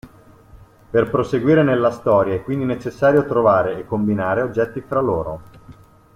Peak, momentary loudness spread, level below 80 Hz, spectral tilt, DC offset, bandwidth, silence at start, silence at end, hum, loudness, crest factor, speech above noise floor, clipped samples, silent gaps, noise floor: -2 dBFS; 7 LU; -48 dBFS; -8.5 dB/octave; under 0.1%; 12 kHz; 0.05 s; 0.45 s; none; -18 LUFS; 16 dB; 28 dB; under 0.1%; none; -46 dBFS